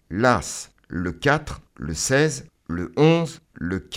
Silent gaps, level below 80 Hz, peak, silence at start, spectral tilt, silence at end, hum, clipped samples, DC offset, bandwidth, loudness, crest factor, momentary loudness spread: none; -44 dBFS; -2 dBFS; 0.1 s; -5 dB/octave; 0 s; none; under 0.1%; under 0.1%; 15.5 kHz; -22 LUFS; 20 dB; 15 LU